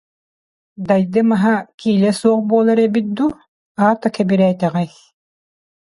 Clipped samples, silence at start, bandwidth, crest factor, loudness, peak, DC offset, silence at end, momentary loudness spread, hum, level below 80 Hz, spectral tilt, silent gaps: under 0.1%; 0.8 s; 11.5 kHz; 16 dB; -16 LUFS; -2 dBFS; under 0.1%; 1.05 s; 7 LU; none; -58 dBFS; -7.5 dB/octave; 1.74-1.78 s, 3.48-3.75 s